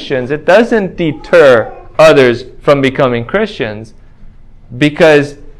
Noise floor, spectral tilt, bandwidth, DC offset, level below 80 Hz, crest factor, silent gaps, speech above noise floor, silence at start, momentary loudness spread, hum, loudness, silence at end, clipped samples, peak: -33 dBFS; -6 dB/octave; 12.5 kHz; under 0.1%; -38 dBFS; 10 dB; none; 24 dB; 0 s; 11 LU; none; -10 LUFS; 0.1 s; 2%; 0 dBFS